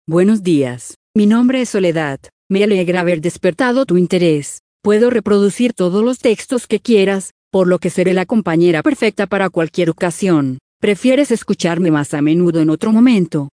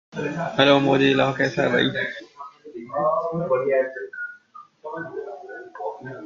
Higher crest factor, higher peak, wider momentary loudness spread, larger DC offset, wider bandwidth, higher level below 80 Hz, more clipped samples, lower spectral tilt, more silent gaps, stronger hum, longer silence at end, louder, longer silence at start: second, 14 dB vs 22 dB; about the same, 0 dBFS vs -2 dBFS; second, 7 LU vs 21 LU; neither; first, 10.5 kHz vs 7.4 kHz; first, -56 dBFS vs -62 dBFS; neither; about the same, -6 dB/octave vs -6 dB/octave; first, 0.96-1.14 s, 2.32-2.50 s, 4.60-4.80 s, 7.31-7.51 s, 10.61-10.80 s vs none; neither; about the same, 0.1 s vs 0 s; first, -15 LUFS vs -22 LUFS; about the same, 0.1 s vs 0.15 s